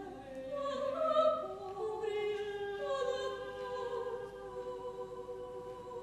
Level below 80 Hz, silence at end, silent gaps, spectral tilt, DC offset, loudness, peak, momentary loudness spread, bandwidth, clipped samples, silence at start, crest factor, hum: -66 dBFS; 0 s; none; -4.5 dB/octave; under 0.1%; -38 LUFS; -18 dBFS; 13 LU; 12.5 kHz; under 0.1%; 0 s; 20 dB; none